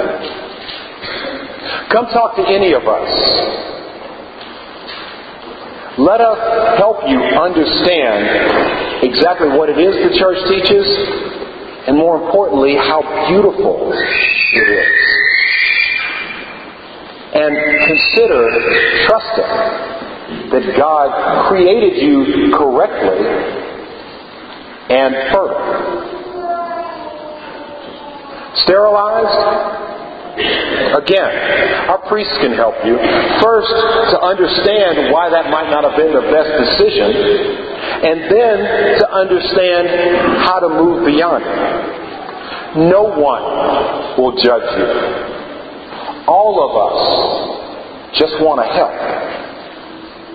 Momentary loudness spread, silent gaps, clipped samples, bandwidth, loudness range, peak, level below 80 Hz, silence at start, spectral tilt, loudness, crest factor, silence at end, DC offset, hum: 18 LU; none; under 0.1%; 5 kHz; 5 LU; 0 dBFS; -44 dBFS; 0 s; -7 dB/octave; -12 LUFS; 14 dB; 0 s; under 0.1%; none